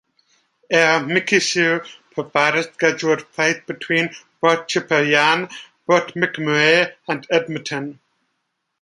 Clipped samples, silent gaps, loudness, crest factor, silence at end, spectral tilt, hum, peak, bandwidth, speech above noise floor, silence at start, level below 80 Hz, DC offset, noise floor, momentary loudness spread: under 0.1%; none; -18 LUFS; 18 dB; 0.9 s; -3.5 dB/octave; none; 0 dBFS; 11.5 kHz; 55 dB; 0.7 s; -70 dBFS; under 0.1%; -74 dBFS; 12 LU